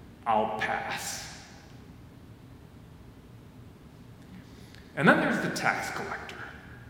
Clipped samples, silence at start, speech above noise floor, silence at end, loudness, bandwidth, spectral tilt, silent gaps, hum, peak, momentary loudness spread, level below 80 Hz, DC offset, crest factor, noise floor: under 0.1%; 0 s; 22 dB; 0 s; -28 LUFS; 17 kHz; -4.5 dB/octave; none; none; -6 dBFS; 26 LU; -58 dBFS; under 0.1%; 26 dB; -50 dBFS